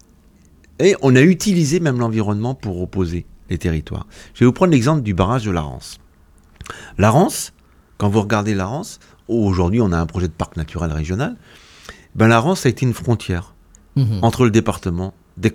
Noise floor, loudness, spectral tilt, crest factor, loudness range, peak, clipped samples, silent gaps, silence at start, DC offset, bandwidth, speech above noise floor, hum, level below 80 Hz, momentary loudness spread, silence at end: -50 dBFS; -18 LUFS; -6.5 dB/octave; 18 dB; 3 LU; 0 dBFS; under 0.1%; none; 0.8 s; under 0.1%; 16.5 kHz; 33 dB; none; -38 dBFS; 16 LU; 0 s